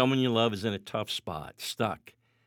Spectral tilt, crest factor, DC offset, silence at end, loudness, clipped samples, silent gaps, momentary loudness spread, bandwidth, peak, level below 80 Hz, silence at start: -5 dB/octave; 22 dB; under 0.1%; 0.35 s; -30 LUFS; under 0.1%; none; 12 LU; 18.5 kHz; -10 dBFS; -66 dBFS; 0 s